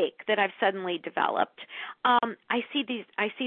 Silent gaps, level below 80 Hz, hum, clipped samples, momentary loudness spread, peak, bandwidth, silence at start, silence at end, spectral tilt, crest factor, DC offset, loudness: none; -78 dBFS; none; under 0.1%; 8 LU; -10 dBFS; 4.5 kHz; 0 s; 0 s; -8 dB/octave; 18 dB; under 0.1%; -28 LUFS